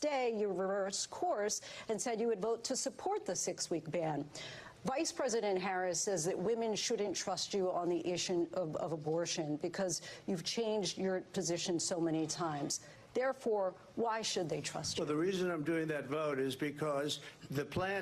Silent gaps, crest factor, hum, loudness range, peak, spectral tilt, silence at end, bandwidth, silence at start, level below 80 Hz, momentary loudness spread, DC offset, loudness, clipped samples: none; 14 dB; none; 2 LU; -22 dBFS; -3.5 dB/octave; 0 s; 13 kHz; 0 s; -72 dBFS; 4 LU; under 0.1%; -37 LUFS; under 0.1%